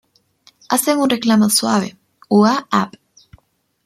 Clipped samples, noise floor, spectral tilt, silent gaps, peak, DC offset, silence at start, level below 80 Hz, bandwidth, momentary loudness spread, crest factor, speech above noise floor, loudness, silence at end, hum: under 0.1%; -61 dBFS; -4 dB/octave; none; -2 dBFS; under 0.1%; 0.7 s; -60 dBFS; 15.5 kHz; 6 LU; 16 dB; 46 dB; -16 LUFS; 0.95 s; none